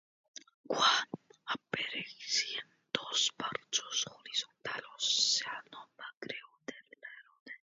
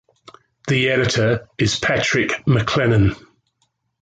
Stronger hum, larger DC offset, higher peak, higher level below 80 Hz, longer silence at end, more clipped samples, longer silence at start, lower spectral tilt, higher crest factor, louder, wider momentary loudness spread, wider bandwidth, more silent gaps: neither; neither; second, -12 dBFS vs -4 dBFS; second, -84 dBFS vs -40 dBFS; second, 0.15 s vs 0.9 s; neither; about the same, 0.7 s vs 0.65 s; second, 1 dB/octave vs -5 dB/octave; first, 26 dB vs 16 dB; second, -33 LUFS vs -18 LUFS; first, 23 LU vs 5 LU; second, 7.6 kHz vs 9.2 kHz; first, 6.17-6.21 s, 7.40-7.46 s vs none